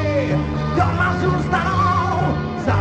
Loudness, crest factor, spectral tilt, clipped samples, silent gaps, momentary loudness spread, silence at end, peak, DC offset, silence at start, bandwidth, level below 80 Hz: -19 LUFS; 14 dB; -7.5 dB/octave; under 0.1%; none; 4 LU; 0 s; -4 dBFS; under 0.1%; 0 s; 8.6 kHz; -34 dBFS